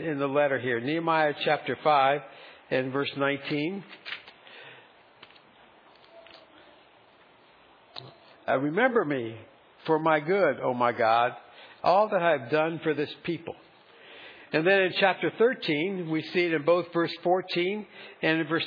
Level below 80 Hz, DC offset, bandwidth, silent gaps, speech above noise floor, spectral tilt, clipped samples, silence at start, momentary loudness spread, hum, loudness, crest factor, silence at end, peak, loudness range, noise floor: -78 dBFS; under 0.1%; 5.2 kHz; none; 31 dB; -7.5 dB/octave; under 0.1%; 0 s; 21 LU; none; -26 LUFS; 20 dB; 0 s; -8 dBFS; 9 LU; -58 dBFS